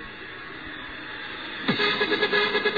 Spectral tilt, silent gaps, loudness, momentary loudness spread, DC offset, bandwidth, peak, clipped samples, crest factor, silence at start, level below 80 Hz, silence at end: -5 dB/octave; none; -25 LUFS; 15 LU; 0.2%; 5 kHz; -10 dBFS; under 0.1%; 18 dB; 0 s; -58 dBFS; 0 s